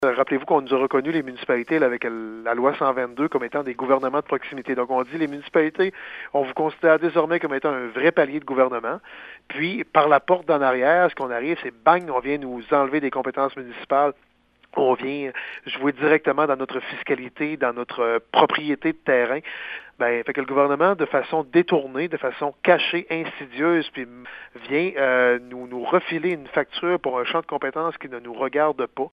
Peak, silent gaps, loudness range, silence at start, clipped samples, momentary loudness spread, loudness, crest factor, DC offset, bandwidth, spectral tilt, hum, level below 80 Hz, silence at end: 0 dBFS; none; 3 LU; 0 s; under 0.1%; 10 LU; -22 LUFS; 22 dB; under 0.1%; 5.4 kHz; -7.5 dB/octave; none; -66 dBFS; 0.05 s